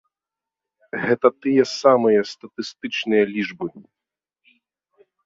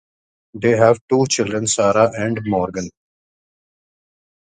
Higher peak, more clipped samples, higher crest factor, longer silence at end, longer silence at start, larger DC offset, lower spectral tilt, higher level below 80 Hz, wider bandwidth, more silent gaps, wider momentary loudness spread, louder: about the same, -2 dBFS vs 0 dBFS; neither; about the same, 20 dB vs 20 dB; second, 1.45 s vs 1.6 s; first, 0.95 s vs 0.55 s; neither; about the same, -5 dB/octave vs -4.5 dB/octave; second, -68 dBFS vs -52 dBFS; second, 7.8 kHz vs 9.6 kHz; second, none vs 1.01-1.08 s; first, 16 LU vs 9 LU; second, -20 LUFS vs -17 LUFS